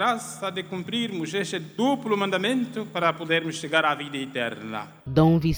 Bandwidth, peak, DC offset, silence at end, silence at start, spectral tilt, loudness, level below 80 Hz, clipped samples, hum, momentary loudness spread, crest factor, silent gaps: over 20 kHz; -6 dBFS; under 0.1%; 0 s; 0 s; -5.5 dB/octave; -26 LUFS; -52 dBFS; under 0.1%; none; 9 LU; 20 dB; none